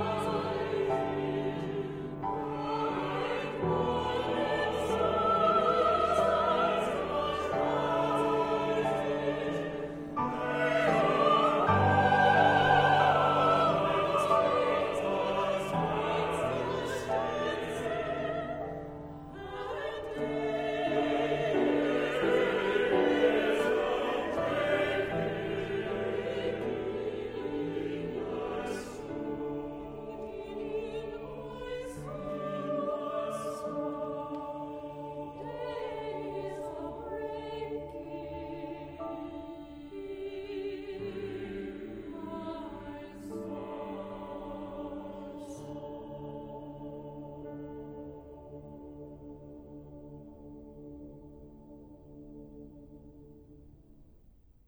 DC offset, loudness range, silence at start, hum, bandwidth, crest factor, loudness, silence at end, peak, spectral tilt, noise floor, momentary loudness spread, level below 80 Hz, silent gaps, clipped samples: under 0.1%; 18 LU; 0 s; none; over 20 kHz; 20 dB; -31 LUFS; 0.55 s; -10 dBFS; -6 dB/octave; -59 dBFS; 19 LU; -56 dBFS; none; under 0.1%